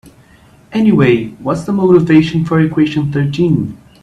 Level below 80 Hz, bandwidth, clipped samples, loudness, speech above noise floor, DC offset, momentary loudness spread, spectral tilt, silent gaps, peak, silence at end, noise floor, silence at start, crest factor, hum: -44 dBFS; 10.5 kHz; under 0.1%; -13 LUFS; 33 dB; under 0.1%; 9 LU; -8 dB/octave; none; 0 dBFS; 0.25 s; -44 dBFS; 0.7 s; 12 dB; none